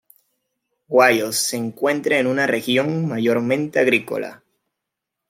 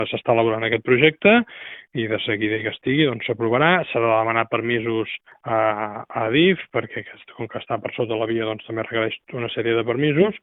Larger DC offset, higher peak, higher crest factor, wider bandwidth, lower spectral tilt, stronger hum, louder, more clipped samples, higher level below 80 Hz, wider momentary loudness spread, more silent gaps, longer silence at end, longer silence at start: neither; about the same, -2 dBFS vs 0 dBFS; about the same, 18 dB vs 20 dB; first, 16.5 kHz vs 4 kHz; second, -4 dB/octave vs -10 dB/octave; neither; about the same, -19 LUFS vs -21 LUFS; neither; second, -70 dBFS vs -60 dBFS; second, 7 LU vs 13 LU; neither; first, 0.95 s vs 0.05 s; first, 0.9 s vs 0 s